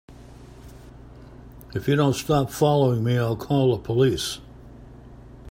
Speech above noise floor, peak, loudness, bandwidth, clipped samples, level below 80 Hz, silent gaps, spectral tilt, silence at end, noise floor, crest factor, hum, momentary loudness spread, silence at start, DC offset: 23 dB; -6 dBFS; -22 LUFS; 16 kHz; under 0.1%; -48 dBFS; none; -6.5 dB/octave; 0 s; -44 dBFS; 18 dB; none; 9 LU; 0.1 s; under 0.1%